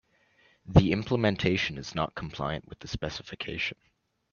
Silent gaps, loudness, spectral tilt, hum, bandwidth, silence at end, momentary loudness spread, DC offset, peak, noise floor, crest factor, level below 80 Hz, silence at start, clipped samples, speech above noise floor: none; -29 LUFS; -6.5 dB/octave; none; 7.2 kHz; 0.6 s; 13 LU; under 0.1%; -2 dBFS; -65 dBFS; 26 dB; -44 dBFS; 0.65 s; under 0.1%; 37 dB